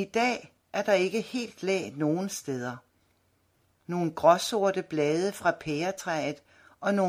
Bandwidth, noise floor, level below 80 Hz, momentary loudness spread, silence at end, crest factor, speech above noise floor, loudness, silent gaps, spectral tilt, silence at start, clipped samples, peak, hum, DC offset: 16 kHz; -69 dBFS; -68 dBFS; 11 LU; 0 s; 22 dB; 42 dB; -29 LUFS; none; -5 dB/octave; 0 s; under 0.1%; -6 dBFS; none; under 0.1%